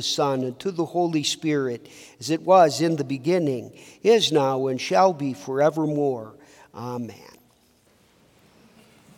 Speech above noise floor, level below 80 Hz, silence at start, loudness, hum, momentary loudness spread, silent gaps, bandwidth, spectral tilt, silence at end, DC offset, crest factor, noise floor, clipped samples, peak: 38 dB; -72 dBFS; 0 s; -23 LUFS; none; 16 LU; none; 17.5 kHz; -5 dB/octave; 1.95 s; under 0.1%; 20 dB; -60 dBFS; under 0.1%; -4 dBFS